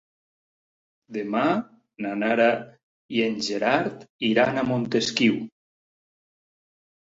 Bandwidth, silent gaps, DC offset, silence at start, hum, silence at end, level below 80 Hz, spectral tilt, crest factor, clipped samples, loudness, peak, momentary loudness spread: 7.8 kHz; 2.83-3.09 s, 4.10-4.19 s; under 0.1%; 1.1 s; none; 1.65 s; -66 dBFS; -5 dB/octave; 22 dB; under 0.1%; -24 LUFS; -6 dBFS; 12 LU